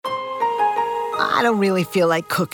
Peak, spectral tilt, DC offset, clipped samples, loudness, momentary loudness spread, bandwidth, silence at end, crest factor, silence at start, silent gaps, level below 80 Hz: -4 dBFS; -5 dB/octave; under 0.1%; under 0.1%; -20 LUFS; 5 LU; over 20 kHz; 0.05 s; 16 dB; 0.05 s; none; -64 dBFS